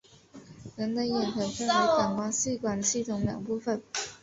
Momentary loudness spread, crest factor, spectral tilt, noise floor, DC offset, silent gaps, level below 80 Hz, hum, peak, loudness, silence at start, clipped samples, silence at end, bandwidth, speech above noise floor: 9 LU; 16 dB; -3.5 dB/octave; -52 dBFS; under 0.1%; none; -60 dBFS; none; -12 dBFS; -29 LUFS; 0.35 s; under 0.1%; 0.05 s; 8.2 kHz; 23 dB